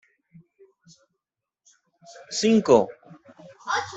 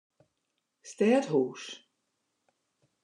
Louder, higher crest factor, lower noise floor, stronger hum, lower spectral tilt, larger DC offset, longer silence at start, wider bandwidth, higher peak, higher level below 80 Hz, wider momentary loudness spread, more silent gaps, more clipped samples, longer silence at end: first, -22 LUFS vs -28 LUFS; about the same, 24 dB vs 20 dB; about the same, -85 dBFS vs -82 dBFS; neither; about the same, -4.5 dB/octave vs -5.5 dB/octave; neither; first, 2.3 s vs 0.85 s; second, 8.2 kHz vs 10.5 kHz; first, -4 dBFS vs -12 dBFS; first, -66 dBFS vs under -90 dBFS; second, 15 LU vs 22 LU; neither; neither; second, 0 s vs 1.3 s